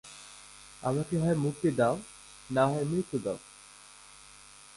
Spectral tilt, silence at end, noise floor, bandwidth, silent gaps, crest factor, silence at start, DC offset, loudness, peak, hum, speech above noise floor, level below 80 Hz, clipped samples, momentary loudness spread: -6.5 dB/octave; 0.4 s; -53 dBFS; 11.5 kHz; none; 20 dB; 0.05 s; under 0.1%; -30 LUFS; -12 dBFS; 50 Hz at -60 dBFS; 24 dB; -62 dBFS; under 0.1%; 23 LU